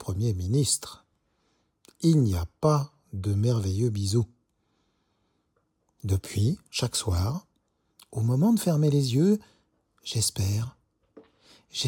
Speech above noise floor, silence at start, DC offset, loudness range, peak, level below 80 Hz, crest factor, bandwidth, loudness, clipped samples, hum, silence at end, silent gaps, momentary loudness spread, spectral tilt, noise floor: 48 dB; 0 s; under 0.1%; 5 LU; -10 dBFS; -54 dBFS; 16 dB; 18 kHz; -26 LUFS; under 0.1%; none; 0 s; none; 13 LU; -6 dB/octave; -73 dBFS